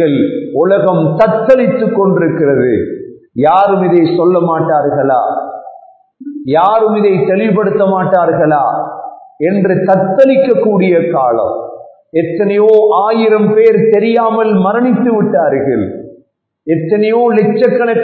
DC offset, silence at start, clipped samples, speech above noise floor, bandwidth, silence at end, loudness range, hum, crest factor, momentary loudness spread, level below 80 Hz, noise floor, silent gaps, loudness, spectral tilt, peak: under 0.1%; 0 s; 0.3%; 41 dB; 4.5 kHz; 0 s; 3 LU; none; 10 dB; 11 LU; -52 dBFS; -51 dBFS; none; -11 LUFS; -10 dB/octave; 0 dBFS